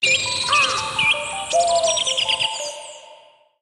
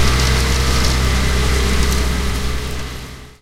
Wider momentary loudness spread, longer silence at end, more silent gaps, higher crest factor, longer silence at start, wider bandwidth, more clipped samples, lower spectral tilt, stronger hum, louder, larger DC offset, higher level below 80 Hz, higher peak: about the same, 12 LU vs 12 LU; first, 0.45 s vs 0.1 s; neither; about the same, 16 dB vs 14 dB; about the same, 0 s vs 0 s; second, 12.5 kHz vs 16 kHz; neither; second, 0 dB/octave vs -4 dB/octave; neither; about the same, -18 LUFS vs -17 LUFS; neither; second, -56 dBFS vs -18 dBFS; second, -6 dBFS vs -2 dBFS